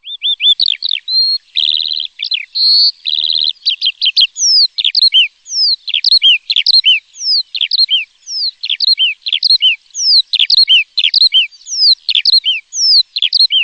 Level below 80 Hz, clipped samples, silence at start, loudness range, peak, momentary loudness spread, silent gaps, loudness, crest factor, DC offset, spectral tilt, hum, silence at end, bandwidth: -66 dBFS; under 0.1%; 0.05 s; 3 LU; -2 dBFS; 8 LU; none; -9 LUFS; 12 dB; under 0.1%; 7 dB/octave; none; 0 s; 9.2 kHz